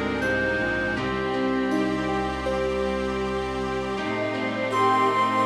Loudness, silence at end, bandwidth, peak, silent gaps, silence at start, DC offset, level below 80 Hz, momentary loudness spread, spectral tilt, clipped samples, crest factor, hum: -25 LUFS; 0 s; 12.5 kHz; -10 dBFS; none; 0 s; under 0.1%; -42 dBFS; 6 LU; -5.5 dB/octave; under 0.1%; 16 dB; none